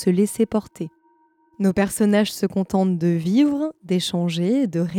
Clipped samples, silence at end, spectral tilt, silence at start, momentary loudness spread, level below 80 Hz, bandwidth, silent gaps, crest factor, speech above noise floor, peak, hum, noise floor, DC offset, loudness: under 0.1%; 0 s; -6 dB/octave; 0 s; 7 LU; -56 dBFS; 17 kHz; none; 14 dB; 40 dB; -6 dBFS; none; -60 dBFS; under 0.1%; -21 LUFS